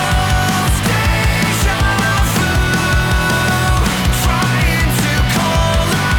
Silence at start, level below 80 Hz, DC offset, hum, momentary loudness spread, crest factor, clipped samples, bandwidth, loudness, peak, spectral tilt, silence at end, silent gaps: 0 s; -20 dBFS; under 0.1%; none; 1 LU; 12 dB; under 0.1%; over 20 kHz; -14 LUFS; -2 dBFS; -4.5 dB/octave; 0 s; none